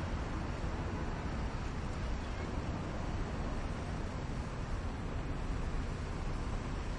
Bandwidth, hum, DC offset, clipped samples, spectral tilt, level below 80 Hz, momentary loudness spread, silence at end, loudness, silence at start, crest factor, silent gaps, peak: 10.5 kHz; none; under 0.1%; under 0.1%; -6.5 dB/octave; -40 dBFS; 1 LU; 0 s; -40 LUFS; 0 s; 12 dB; none; -24 dBFS